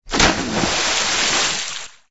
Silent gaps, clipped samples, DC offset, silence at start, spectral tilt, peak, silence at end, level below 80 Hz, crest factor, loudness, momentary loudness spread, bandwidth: none; under 0.1%; under 0.1%; 0 s; -1.5 dB/octave; -2 dBFS; 0 s; -36 dBFS; 18 dB; -17 LUFS; 9 LU; 8.2 kHz